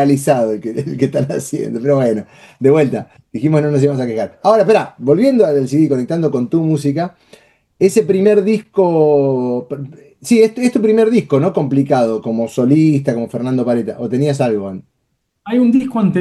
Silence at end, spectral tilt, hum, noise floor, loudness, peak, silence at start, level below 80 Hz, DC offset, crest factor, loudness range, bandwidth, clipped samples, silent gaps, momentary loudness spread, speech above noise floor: 0 s; -7.5 dB/octave; none; -68 dBFS; -14 LUFS; 0 dBFS; 0 s; -60 dBFS; under 0.1%; 14 dB; 3 LU; 12.5 kHz; under 0.1%; none; 9 LU; 54 dB